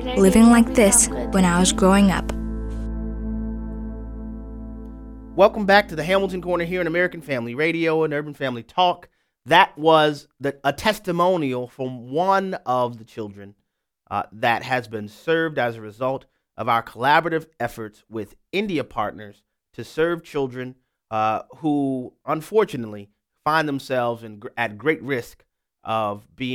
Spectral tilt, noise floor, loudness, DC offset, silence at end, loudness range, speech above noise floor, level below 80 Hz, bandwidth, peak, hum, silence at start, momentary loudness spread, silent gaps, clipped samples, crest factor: -4.5 dB/octave; -68 dBFS; -21 LUFS; under 0.1%; 0 s; 6 LU; 47 dB; -38 dBFS; 16.5 kHz; -2 dBFS; none; 0 s; 18 LU; none; under 0.1%; 20 dB